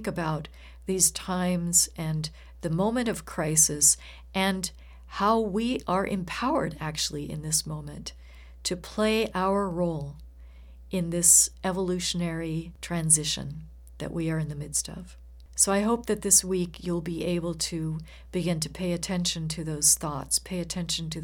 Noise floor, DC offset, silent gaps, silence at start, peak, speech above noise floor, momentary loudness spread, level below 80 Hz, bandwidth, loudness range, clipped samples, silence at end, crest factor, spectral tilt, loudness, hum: -47 dBFS; under 0.1%; none; 0 s; -4 dBFS; 20 dB; 15 LU; -48 dBFS; 19 kHz; 6 LU; under 0.1%; 0 s; 24 dB; -3 dB/octave; -26 LUFS; none